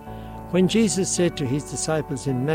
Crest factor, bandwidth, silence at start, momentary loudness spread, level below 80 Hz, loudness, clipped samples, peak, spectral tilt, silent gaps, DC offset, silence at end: 14 dB; 16 kHz; 0 s; 7 LU; -46 dBFS; -23 LUFS; under 0.1%; -10 dBFS; -5 dB/octave; none; under 0.1%; 0 s